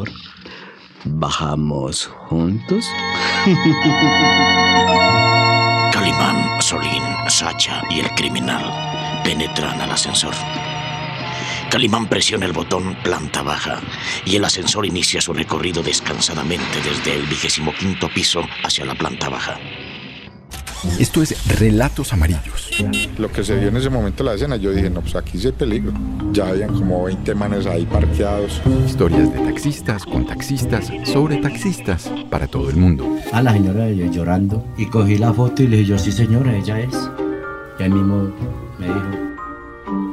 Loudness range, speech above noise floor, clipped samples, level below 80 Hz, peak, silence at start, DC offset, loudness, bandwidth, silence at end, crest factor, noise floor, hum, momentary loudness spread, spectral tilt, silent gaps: 6 LU; 21 dB; under 0.1%; -32 dBFS; -2 dBFS; 0 s; under 0.1%; -18 LUFS; 15 kHz; 0 s; 14 dB; -39 dBFS; none; 10 LU; -4.5 dB/octave; none